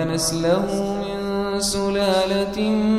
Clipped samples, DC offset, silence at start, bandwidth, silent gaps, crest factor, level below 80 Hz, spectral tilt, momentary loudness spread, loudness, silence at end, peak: under 0.1%; under 0.1%; 0 s; 14.5 kHz; none; 14 dB; -42 dBFS; -4.5 dB/octave; 5 LU; -21 LUFS; 0 s; -6 dBFS